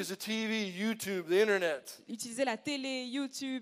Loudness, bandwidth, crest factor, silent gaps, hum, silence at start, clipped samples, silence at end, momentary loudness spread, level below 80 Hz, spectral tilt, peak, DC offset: -34 LUFS; 15.5 kHz; 18 dB; none; none; 0 s; under 0.1%; 0 s; 11 LU; -86 dBFS; -3.5 dB/octave; -16 dBFS; under 0.1%